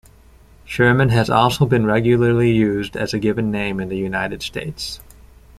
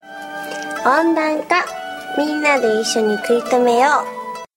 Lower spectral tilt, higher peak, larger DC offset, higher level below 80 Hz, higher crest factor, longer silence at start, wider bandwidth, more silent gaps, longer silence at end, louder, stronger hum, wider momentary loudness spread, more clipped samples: first, -6.5 dB/octave vs -3 dB/octave; about the same, -2 dBFS vs -2 dBFS; neither; first, -42 dBFS vs -64 dBFS; about the same, 16 dB vs 16 dB; first, 0.65 s vs 0.05 s; second, 14.5 kHz vs 16.5 kHz; neither; first, 0.6 s vs 0.1 s; about the same, -18 LUFS vs -17 LUFS; neither; about the same, 12 LU vs 13 LU; neither